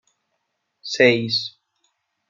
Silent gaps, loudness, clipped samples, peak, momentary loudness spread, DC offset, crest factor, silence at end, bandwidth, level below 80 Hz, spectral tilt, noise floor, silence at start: none; -19 LUFS; under 0.1%; -2 dBFS; 18 LU; under 0.1%; 22 dB; 0.8 s; 7.4 kHz; -70 dBFS; -4.5 dB/octave; -75 dBFS; 0.85 s